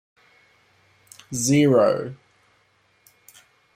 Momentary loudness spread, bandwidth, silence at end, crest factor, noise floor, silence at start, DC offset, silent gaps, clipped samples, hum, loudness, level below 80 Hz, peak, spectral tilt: 16 LU; 16 kHz; 1.6 s; 18 dB; -63 dBFS; 1.3 s; under 0.1%; none; under 0.1%; none; -20 LUFS; -64 dBFS; -6 dBFS; -5.5 dB/octave